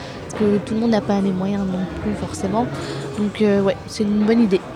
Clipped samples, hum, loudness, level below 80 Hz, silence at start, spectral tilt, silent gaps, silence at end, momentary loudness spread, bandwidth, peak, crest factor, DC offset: under 0.1%; none; -20 LUFS; -44 dBFS; 0 s; -6.5 dB/octave; none; 0 s; 8 LU; 11.5 kHz; -6 dBFS; 14 dB; under 0.1%